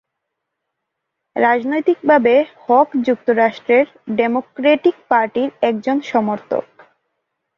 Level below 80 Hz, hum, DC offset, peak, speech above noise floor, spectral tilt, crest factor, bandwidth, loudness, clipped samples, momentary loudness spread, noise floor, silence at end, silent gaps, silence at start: -64 dBFS; none; under 0.1%; -2 dBFS; 62 dB; -6.5 dB/octave; 16 dB; 7 kHz; -16 LUFS; under 0.1%; 7 LU; -78 dBFS; 0.95 s; none; 1.35 s